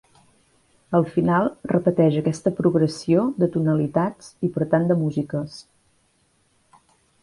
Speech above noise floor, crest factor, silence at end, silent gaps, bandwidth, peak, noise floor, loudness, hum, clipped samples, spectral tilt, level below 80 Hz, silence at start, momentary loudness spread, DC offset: 43 dB; 18 dB; 1.6 s; none; 11.5 kHz; -6 dBFS; -64 dBFS; -22 LUFS; none; under 0.1%; -8 dB/octave; -58 dBFS; 0.9 s; 8 LU; under 0.1%